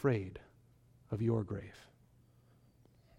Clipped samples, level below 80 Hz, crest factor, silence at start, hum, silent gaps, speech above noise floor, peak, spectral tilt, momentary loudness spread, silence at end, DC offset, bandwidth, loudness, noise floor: under 0.1%; -66 dBFS; 20 dB; 0 s; none; none; 31 dB; -20 dBFS; -9 dB/octave; 21 LU; 1.35 s; under 0.1%; 9.2 kHz; -38 LUFS; -66 dBFS